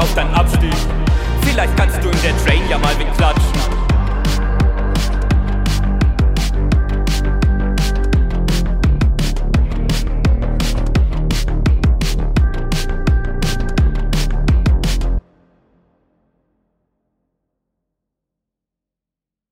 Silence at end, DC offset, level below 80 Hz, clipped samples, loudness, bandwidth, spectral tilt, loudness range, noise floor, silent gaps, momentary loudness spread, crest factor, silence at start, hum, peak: 4.3 s; under 0.1%; -16 dBFS; under 0.1%; -17 LUFS; 16 kHz; -5.5 dB/octave; 5 LU; -86 dBFS; none; 4 LU; 14 dB; 0 s; none; 0 dBFS